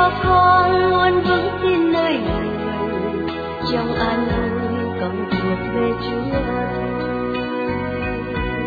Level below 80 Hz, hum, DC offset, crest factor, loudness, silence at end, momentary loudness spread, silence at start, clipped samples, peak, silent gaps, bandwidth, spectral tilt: -36 dBFS; none; under 0.1%; 16 dB; -19 LUFS; 0 s; 9 LU; 0 s; under 0.1%; -2 dBFS; none; 4.9 kHz; -8.5 dB/octave